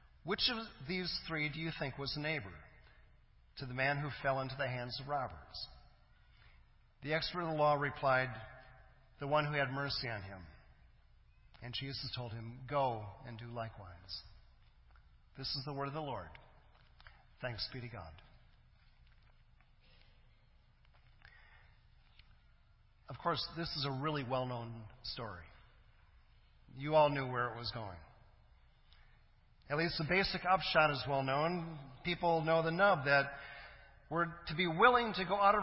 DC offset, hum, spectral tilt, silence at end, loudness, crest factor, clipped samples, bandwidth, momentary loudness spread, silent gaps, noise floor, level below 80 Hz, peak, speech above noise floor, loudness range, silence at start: under 0.1%; none; -8.5 dB/octave; 0 s; -36 LUFS; 26 dB; under 0.1%; 5.8 kHz; 19 LU; none; -66 dBFS; -62 dBFS; -14 dBFS; 30 dB; 12 LU; 0.25 s